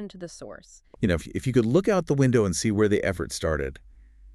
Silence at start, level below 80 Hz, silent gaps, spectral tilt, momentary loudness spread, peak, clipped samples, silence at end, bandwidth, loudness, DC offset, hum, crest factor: 0 s; -44 dBFS; none; -6 dB/octave; 17 LU; -8 dBFS; under 0.1%; 0 s; 13 kHz; -24 LUFS; under 0.1%; none; 18 dB